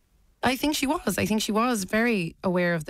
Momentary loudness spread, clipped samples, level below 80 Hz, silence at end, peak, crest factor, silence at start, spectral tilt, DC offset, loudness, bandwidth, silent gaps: 3 LU; under 0.1%; -52 dBFS; 0.05 s; -12 dBFS; 14 dB; 0.45 s; -4.5 dB/octave; under 0.1%; -25 LUFS; 16 kHz; none